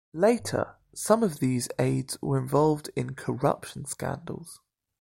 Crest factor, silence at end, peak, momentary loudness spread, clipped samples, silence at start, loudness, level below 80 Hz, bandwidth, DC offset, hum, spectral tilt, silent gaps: 20 dB; 0.45 s; -8 dBFS; 12 LU; under 0.1%; 0.15 s; -28 LUFS; -58 dBFS; 16.5 kHz; under 0.1%; none; -6 dB/octave; none